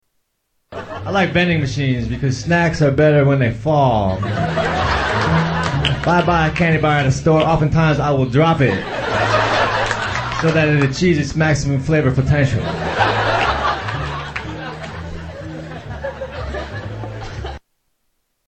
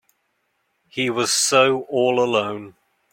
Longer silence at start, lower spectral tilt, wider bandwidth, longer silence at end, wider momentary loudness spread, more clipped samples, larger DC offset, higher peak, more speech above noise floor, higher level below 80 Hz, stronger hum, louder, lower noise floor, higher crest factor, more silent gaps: second, 0.7 s vs 0.95 s; first, -6 dB/octave vs -2.5 dB/octave; second, 8.6 kHz vs 16.5 kHz; first, 0.9 s vs 0.4 s; about the same, 15 LU vs 14 LU; neither; neither; about the same, -2 dBFS vs -2 dBFS; about the same, 54 dB vs 51 dB; first, -34 dBFS vs -68 dBFS; neither; about the same, -17 LUFS vs -19 LUFS; about the same, -69 dBFS vs -70 dBFS; about the same, 16 dB vs 20 dB; neither